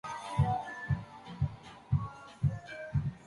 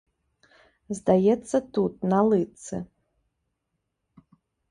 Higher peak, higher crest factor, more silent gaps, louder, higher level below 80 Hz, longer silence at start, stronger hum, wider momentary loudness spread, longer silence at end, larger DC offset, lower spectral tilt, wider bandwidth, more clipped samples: second, -16 dBFS vs -6 dBFS; about the same, 18 dB vs 20 dB; neither; second, -35 LUFS vs -24 LUFS; first, -48 dBFS vs -60 dBFS; second, 0.05 s vs 0.9 s; neither; second, 11 LU vs 15 LU; second, 0 s vs 1.85 s; neither; about the same, -7.5 dB/octave vs -7.5 dB/octave; about the same, 11.5 kHz vs 11 kHz; neither